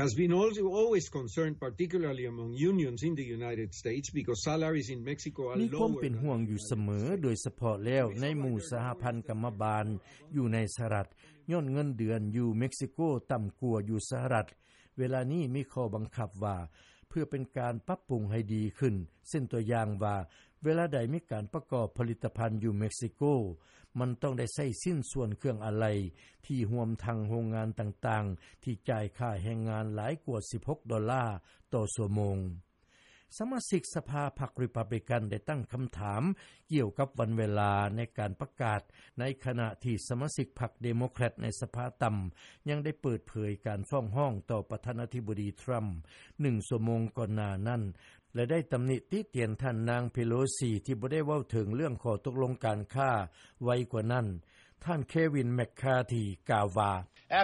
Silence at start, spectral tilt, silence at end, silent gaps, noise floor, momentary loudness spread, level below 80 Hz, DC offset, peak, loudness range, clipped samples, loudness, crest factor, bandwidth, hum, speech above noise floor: 0 s; -6.5 dB/octave; 0 s; none; -65 dBFS; 7 LU; -60 dBFS; under 0.1%; -16 dBFS; 3 LU; under 0.1%; -34 LUFS; 18 dB; 11.5 kHz; none; 32 dB